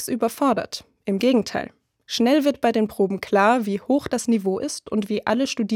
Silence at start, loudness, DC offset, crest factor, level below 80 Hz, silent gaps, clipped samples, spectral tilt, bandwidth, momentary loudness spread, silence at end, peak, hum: 0 s; -22 LUFS; under 0.1%; 16 dB; -62 dBFS; none; under 0.1%; -4.5 dB/octave; 17 kHz; 10 LU; 0 s; -4 dBFS; none